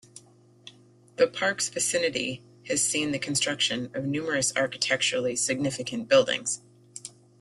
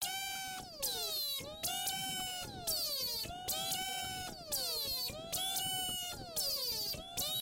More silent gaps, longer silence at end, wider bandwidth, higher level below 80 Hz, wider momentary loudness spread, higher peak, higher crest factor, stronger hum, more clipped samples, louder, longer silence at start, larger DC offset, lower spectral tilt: neither; first, 0.3 s vs 0 s; second, 12.5 kHz vs 17 kHz; second, -68 dBFS vs -62 dBFS; first, 17 LU vs 5 LU; first, -6 dBFS vs -24 dBFS; first, 22 dB vs 16 dB; neither; neither; first, -26 LUFS vs -37 LUFS; first, 0.15 s vs 0 s; neither; first, -2.5 dB/octave vs -0.5 dB/octave